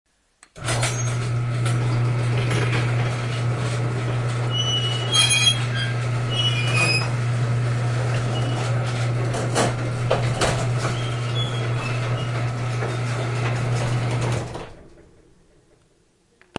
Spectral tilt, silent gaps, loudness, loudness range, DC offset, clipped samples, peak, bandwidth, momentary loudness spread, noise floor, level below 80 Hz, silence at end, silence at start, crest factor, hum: -4.5 dB/octave; none; -22 LUFS; 6 LU; under 0.1%; under 0.1%; -6 dBFS; 11.5 kHz; 7 LU; -61 dBFS; -44 dBFS; 1.7 s; 0.55 s; 18 dB; none